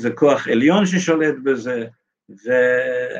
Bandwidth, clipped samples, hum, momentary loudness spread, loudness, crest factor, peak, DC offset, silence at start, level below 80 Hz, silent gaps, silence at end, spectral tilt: 8.6 kHz; under 0.1%; none; 11 LU; -18 LUFS; 16 dB; -2 dBFS; under 0.1%; 0 s; -66 dBFS; none; 0 s; -5.5 dB/octave